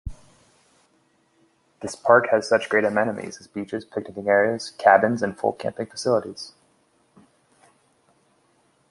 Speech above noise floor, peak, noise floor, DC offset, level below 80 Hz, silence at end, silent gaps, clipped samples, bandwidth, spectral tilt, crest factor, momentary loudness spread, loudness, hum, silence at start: 42 dB; -2 dBFS; -64 dBFS; under 0.1%; -52 dBFS; 2.4 s; none; under 0.1%; 11.5 kHz; -5 dB/octave; 22 dB; 18 LU; -22 LUFS; none; 0.05 s